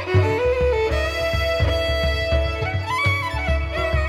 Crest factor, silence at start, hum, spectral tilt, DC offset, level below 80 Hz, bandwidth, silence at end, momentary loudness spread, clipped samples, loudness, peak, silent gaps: 14 dB; 0 s; none; -5.5 dB/octave; under 0.1%; -28 dBFS; 14 kHz; 0 s; 3 LU; under 0.1%; -21 LUFS; -6 dBFS; none